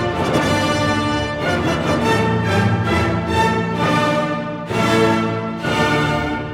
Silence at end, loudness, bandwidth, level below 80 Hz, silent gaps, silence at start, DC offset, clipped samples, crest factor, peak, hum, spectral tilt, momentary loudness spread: 0 s; -18 LUFS; 16.5 kHz; -38 dBFS; none; 0 s; under 0.1%; under 0.1%; 16 dB; -2 dBFS; none; -5.5 dB/octave; 4 LU